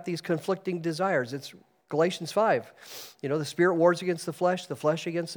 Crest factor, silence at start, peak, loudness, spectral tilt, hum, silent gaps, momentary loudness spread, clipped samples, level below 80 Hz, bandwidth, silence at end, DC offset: 18 dB; 0 s; -10 dBFS; -28 LUFS; -5.5 dB/octave; none; none; 14 LU; under 0.1%; -84 dBFS; over 20 kHz; 0 s; under 0.1%